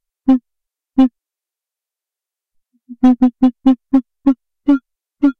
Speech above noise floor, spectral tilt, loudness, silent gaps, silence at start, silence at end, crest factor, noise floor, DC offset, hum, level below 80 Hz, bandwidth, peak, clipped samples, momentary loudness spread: 75 dB; -7.5 dB/octave; -16 LUFS; none; 0.25 s; 0.05 s; 14 dB; -88 dBFS; under 0.1%; none; -48 dBFS; 4.4 kHz; -2 dBFS; under 0.1%; 5 LU